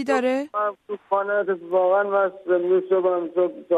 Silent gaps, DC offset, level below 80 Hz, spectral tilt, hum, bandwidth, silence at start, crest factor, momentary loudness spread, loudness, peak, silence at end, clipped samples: none; under 0.1%; -76 dBFS; -6 dB/octave; none; 11 kHz; 0 s; 14 dB; 6 LU; -22 LUFS; -8 dBFS; 0 s; under 0.1%